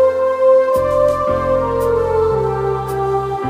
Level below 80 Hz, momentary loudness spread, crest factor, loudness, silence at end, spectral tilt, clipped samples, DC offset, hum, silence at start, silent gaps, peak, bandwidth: -36 dBFS; 6 LU; 12 dB; -16 LUFS; 0 s; -7 dB/octave; under 0.1%; under 0.1%; none; 0 s; none; -2 dBFS; 15.5 kHz